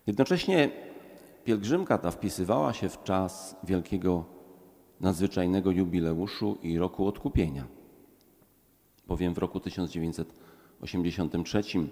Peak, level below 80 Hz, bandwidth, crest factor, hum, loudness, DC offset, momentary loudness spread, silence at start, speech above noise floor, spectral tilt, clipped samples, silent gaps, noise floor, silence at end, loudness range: -10 dBFS; -48 dBFS; 16.5 kHz; 20 dB; none; -30 LUFS; under 0.1%; 12 LU; 0.05 s; 36 dB; -6.5 dB/octave; under 0.1%; none; -65 dBFS; 0 s; 5 LU